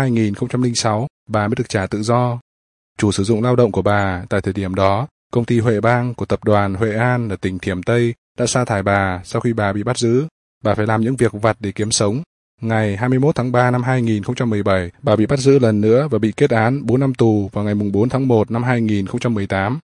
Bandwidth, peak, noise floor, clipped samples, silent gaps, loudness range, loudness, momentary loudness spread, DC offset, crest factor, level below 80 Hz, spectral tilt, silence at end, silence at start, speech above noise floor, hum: 11 kHz; 0 dBFS; under -90 dBFS; under 0.1%; 1.10-1.26 s, 2.41-2.96 s, 5.11-5.30 s, 8.18-8.35 s, 10.31-10.61 s, 12.26-12.58 s; 3 LU; -18 LUFS; 6 LU; under 0.1%; 18 dB; -50 dBFS; -6 dB/octave; 0.05 s; 0 s; over 73 dB; none